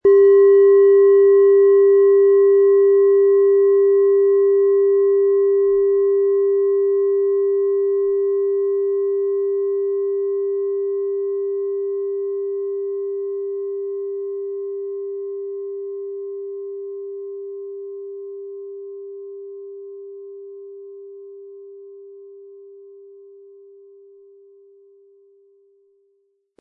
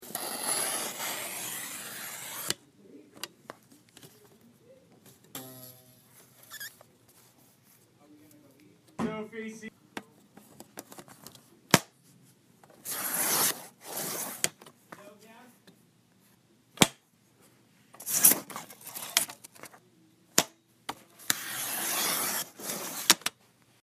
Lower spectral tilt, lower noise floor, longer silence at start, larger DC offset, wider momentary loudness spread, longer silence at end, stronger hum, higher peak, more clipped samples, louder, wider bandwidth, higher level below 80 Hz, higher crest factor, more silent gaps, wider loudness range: first, -9 dB/octave vs -1.5 dB/octave; about the same, -66 dBFS vs -64 dBFS; about the same, 0.05 s vs 0 s; neither; about the same, 23 LU vs 23 LU; first, 3.95 s vs 0.5 s; neither; second, -6 dBFS vs 0 dBFS; neither; first, -17 LUFS vs -29 LUFS; second, 2.1 kHz vs 15.5 kHz; first, -68 dBFS vs -74 dBFS; second, 12 dB vs 34 dB; neither; about the same, 22 LU vs 20 LU